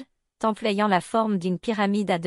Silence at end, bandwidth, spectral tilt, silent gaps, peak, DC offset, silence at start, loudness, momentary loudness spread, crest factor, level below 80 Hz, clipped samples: 0 s; 12 kHz; -6 dB/octave; none; -8 dBFS; under 0.1%; 0 s; -24 LUFS; 5 LU; 16 dB; -64 dBFS; under 0.1%